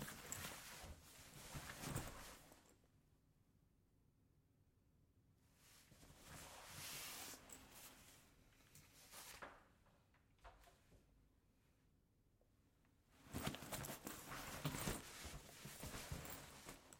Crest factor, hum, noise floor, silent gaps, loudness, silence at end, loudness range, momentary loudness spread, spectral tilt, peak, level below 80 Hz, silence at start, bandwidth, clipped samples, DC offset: 28 dB; none; -78 dBFS; none; -53 LUFS; 0 s; 13 LU; 18 LU; -3.5 dB/octave; -30 dBFS; -68 dBFS; 0 s; 16.5 kHz; under 0.1%; under 0.1%